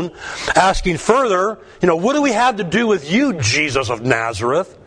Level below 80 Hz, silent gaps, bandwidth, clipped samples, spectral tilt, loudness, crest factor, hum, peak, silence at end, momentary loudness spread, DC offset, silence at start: -36 dBFS; none; 10.5 kHz; under 0.1%; -4.5 dB/octave; -17 LUFS; 16 dB; none; 0 dBFS; 0.15 s; 5 LU; under 0.1%; 0 s